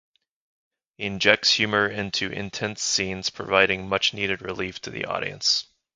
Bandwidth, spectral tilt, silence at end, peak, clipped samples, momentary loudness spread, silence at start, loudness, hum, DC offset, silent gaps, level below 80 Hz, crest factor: 11 kHz; -2.5 dB/octave; 0.35 s; 0 dBFS; under 0.1%; 12 LU; 1 s; -23 LUFS; none; under 0.1%; none; -56 dBFS; 26 dB